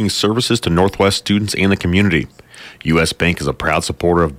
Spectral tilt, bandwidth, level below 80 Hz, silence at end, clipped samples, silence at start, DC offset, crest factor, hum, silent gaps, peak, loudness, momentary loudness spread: -5 dB/octave; 16 kHz; -36 dBFS; 0 s; under 0.1%; 0 s; under 0.1%; 14 dB; none; none; -2 dBFS; -16 LUFS; 4 LU